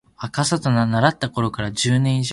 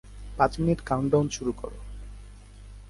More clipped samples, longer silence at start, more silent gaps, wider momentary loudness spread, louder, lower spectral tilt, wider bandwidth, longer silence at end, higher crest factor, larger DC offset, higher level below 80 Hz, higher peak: neither; first, 0.2 s vs 0.05 s; neither; second, 5 LU vs 20 LU; first, -20 LUFS vs -26 LUFS; second, -5 dB/octave vs -6.5 dB/octave; about the same, 11.5 kHz vs 11.5 kHz; about the same, 0 s vs 0 s; about the same, 18 dB vs 22 dB; neither; second, -48 dBFS vs -42 dBFS; first, -2 dBFS vs -6 dBFS